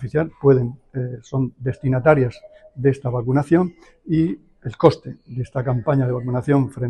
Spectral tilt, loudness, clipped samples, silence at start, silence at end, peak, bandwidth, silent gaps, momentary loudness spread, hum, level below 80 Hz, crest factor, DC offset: -9 dB/octave; -20 LUFS; under 0.1%; 0 s; 0 s; 0 dBFS; 9.4 kHz; none; 12 LU; none; -48 dBFS; 20 dB; under 0.1%